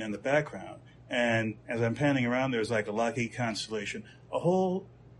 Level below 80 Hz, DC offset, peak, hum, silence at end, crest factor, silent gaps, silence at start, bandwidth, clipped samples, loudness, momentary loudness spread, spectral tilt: -62 dBFS; under 0.1%; -14 dBFS; none; 0.1 s; 18 dB; none; 0 s; 11.5 kHz; under 0.1%; -30 LUFS; 11 LU; -5.5 dB/octave